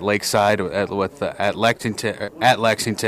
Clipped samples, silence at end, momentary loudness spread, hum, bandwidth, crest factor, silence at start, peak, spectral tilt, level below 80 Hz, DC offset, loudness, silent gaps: under 0.1%; 0 s; 7 LU; none; 15.5 kHz; 16 dB; 0 s; -4 dBFS; -4 dB/octave; -56 dBFS; under 0.1%; -20 LUFS; none